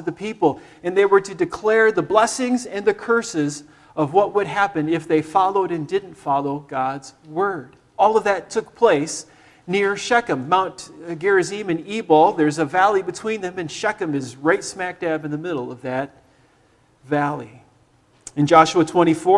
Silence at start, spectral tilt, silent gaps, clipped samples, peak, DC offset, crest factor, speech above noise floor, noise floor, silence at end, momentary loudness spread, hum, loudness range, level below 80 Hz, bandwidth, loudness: 0 s; -5 dB/octave; none; under 0.1%; 0 dBFS; under 0.1%; 20 dB; 38 dB; -57 dBFS; 0 s; 11 LU; none; 6 LU; -60 dBFS; 12 kHz; -20 LUFS